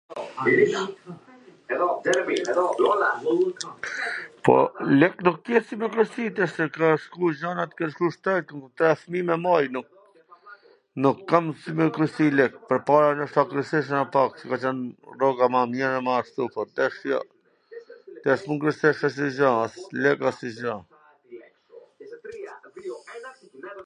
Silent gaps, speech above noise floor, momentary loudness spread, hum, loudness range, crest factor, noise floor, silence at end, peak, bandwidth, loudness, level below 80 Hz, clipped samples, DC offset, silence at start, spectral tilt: none; 31 dB; 18 LU; none; 4 LU; 22 dB; -54 dBFS; 0.05 s; -2 dBFS; 10.5 kHz; -24 LUFS; -70 dBFS; under 0.1%; under 0.1%; 0.1 s; -6 dB/octave